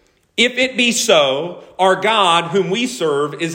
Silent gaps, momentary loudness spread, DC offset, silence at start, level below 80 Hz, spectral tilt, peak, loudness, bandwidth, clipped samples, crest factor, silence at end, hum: none; 7 LU; under 0.1%; 0.35 s; -62 dBFS; -2.5 dB/octave; 0 dBFS; -15 LUFS; 16.5 kHz; under 0.1%; 16 dB; 0 s; none